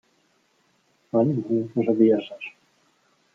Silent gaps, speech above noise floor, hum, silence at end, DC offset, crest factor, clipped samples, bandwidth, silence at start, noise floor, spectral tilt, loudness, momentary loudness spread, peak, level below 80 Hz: none; 44 dB; none; 0.85 s; under 0.1%; 18 dB; under 0.1%; 4.8 kHz; 1.15 s; -66 dBFS; -9.5 dB/octave; -22 LUFS; 18 LU; -6 dBFS; -74 dBFS